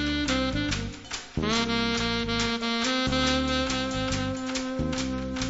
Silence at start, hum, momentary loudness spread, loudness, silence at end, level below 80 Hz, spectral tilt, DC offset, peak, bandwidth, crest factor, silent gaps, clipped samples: 0 s; none; 6 LU; -27 LUFS; 0 s; -40 dBFS; -4 dB/octave; under 0.1%; -12 dBFS; 8 kHz; 16 dB; none; under 0.1%